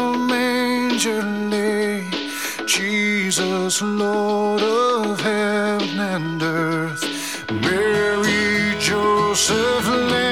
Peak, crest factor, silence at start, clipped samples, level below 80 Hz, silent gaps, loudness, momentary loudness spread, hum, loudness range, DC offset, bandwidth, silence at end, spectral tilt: -4 dBFS; 16 dB; 0 s; under 0.1%; -52 dBFS; none; -19 LUFS; 6 LU; none; 2 LU; 0.3%; 16.5 kHz; 0 s; -3.5 dB/octave